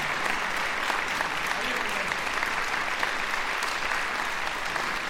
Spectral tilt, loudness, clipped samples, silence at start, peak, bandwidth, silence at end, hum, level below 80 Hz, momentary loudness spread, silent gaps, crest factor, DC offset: -1.5 dB/octave; -27 LUFS; under 0.1%; 0 s; -10 dBFS; 16.5 kHz; 0 s; none; -48 dBFS; 2 LU; none; 20 dB; under 0.1%